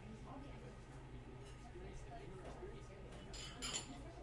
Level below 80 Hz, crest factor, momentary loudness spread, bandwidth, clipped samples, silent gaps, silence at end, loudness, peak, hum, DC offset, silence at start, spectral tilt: -58 dBFS; 22 dB; 11 LU; 11.5 kHz; under 0.1%; none; 0 s; -52 LUFS; -30 dBFS; none; under 0.1%; 0 s; -3.5 dB/octave